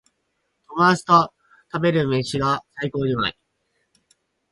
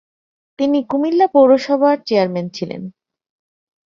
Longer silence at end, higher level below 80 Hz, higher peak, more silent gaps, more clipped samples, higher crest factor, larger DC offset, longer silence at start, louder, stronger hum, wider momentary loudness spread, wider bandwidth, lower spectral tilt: first, 1.2 s vs 0.95 s; first, -54 dBFS vs -62 dBFS; about the same, -2 dBFS vs -2 dBFS; neither; neither; about the same, 20 dB vs 16 dB; neither; about the same, 0.7 s vs 0.6 s; second, -21 LUFS vs -15 LUFS; neither; second, 11 LU vs 15 LU; first, 11.5 kHz vs 7.2 kHz; about the same, -6 dB/octave vs -7 dB/octave